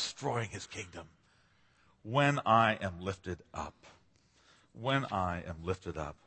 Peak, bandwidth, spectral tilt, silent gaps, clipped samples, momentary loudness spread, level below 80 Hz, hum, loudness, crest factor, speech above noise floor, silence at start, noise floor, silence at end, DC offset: -12 dBFS; 8.4 kHz; -5 dB/octave; none; under 0.1%; 17 LU; -60 dBFS; none; -34 LUFS; 22 dB; 34 dB; 0 s; -68 dBFS; 0.1 s; under 0.1%